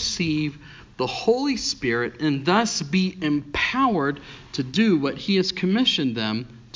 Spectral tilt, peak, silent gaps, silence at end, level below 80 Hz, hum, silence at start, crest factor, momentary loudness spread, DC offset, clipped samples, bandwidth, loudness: -4.5 dB/octave; -6 dBFS; none; 0.15 s; -50 dBFS; none; 0 s; 18 dB; 8 LU; under 0.1%; under 0.1%; 7.6 kHz; -23 LUFS